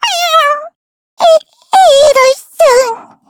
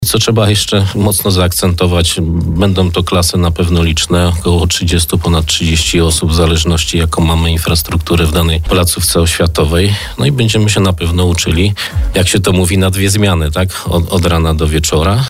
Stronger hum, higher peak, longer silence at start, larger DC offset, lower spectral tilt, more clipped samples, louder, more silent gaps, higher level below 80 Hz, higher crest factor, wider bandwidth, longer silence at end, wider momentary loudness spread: neither; about the same, 0 dBFS vs -2 dBFS; about the same, 0 s vs 0 s; neither; second, 0.5 dB/octave vs -4.5 dB/octave; first, 0.3% vs under 0.1%; about the same, -9 LUFS vs -11 LUFS; first, 0.75-1.17 s vs none; second, -48 dBFS vs -20 dBFS; about the same, 10 dB vs 10 dB; first, 19 kHz vs 16 kHz; first, 0.3 s vs 0 s; first, 7 LU vs 3 LU